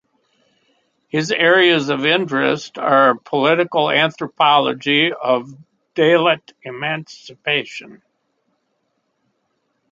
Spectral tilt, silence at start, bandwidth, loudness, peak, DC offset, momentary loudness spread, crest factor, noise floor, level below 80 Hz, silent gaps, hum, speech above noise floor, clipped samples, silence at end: -5 dB/octave; 1.15 s; 7.8 kHz; -16 LUFS; 0 dBFS; under 0.1%; 12 LU; 18 dB; -69 dBFS; -68 dBFS; none; none; 52 dB; under 0.1%; 2 s